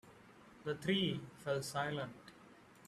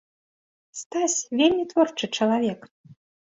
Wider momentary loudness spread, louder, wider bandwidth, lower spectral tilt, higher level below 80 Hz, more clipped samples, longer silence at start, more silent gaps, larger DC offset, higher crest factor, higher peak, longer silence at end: first, 25 LU vs 17 LU; second, -40 LUFS vs -23 LUFS; first, 14 kHz vs 8 kHz; first, -5 dB/octave vs -3 dB/octave; second, -74 dBFS vs -66 dBFS; neither; second, 0.05 s vs 0.75 s; second, none vs 0.86-0.90 s, 2.71-2.84 s; neither; about the same, 20 dB vs 18 dB; second, -22 dBFS vs -6 dBFS; second, 0 s vs 0.35 s